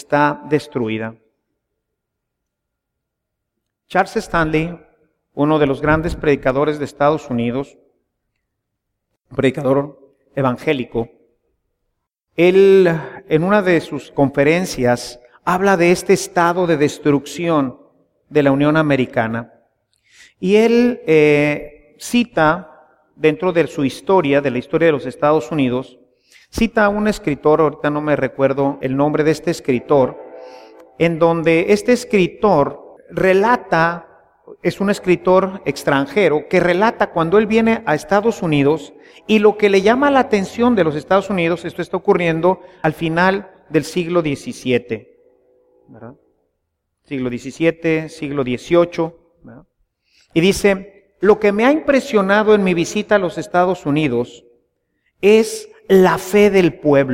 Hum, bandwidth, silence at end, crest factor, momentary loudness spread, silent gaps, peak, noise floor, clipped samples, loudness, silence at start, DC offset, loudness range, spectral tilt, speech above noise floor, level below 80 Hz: none; 16 kHz; 0 s; 16 dB; 10 LU; none; 0 dBFS; -78 dBFS; under 0.1%; -16 LUFS; 0.1 s; under 0.1%; 7 LU; -6 dB/octave; 62 dB; -44 dBFS